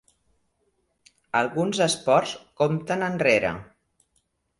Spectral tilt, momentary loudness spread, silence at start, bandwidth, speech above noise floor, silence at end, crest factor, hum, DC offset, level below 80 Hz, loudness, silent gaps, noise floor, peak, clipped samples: -4.5 dB/octave; 8 LU; 1.35 s; 11.5 kHz; 48 dB; 0.95 s; 22 dB; none; under 0.1%; -60 dBFS; -24 LUFS; none; -72 dBFS; -4 dBFS; under 0.1%